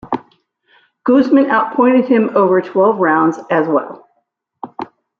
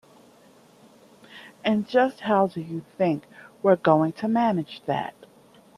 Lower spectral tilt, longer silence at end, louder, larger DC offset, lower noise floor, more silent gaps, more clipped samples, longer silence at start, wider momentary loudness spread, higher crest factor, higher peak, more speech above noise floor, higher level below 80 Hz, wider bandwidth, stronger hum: about the same, -8 dB/octave vs -7.5 dB/octave; second, 0.35 s vs 0.7 s; first, -14 LUFS vs -24 LUFS; neither; first, -67 dBFS vs -54 dBFS; neither; neither; second, 0.05 s vs 1.35 s; first, 18 LU vs 13 LU; second, 14 dB vs 22 dB; about the same, -2 dBFS vs -4 dBFS; first, 54 dB vs 31 dB; first, -62 dBFS vs -70 dBFS; second, 6.8 kHz vs 13 kHz; neither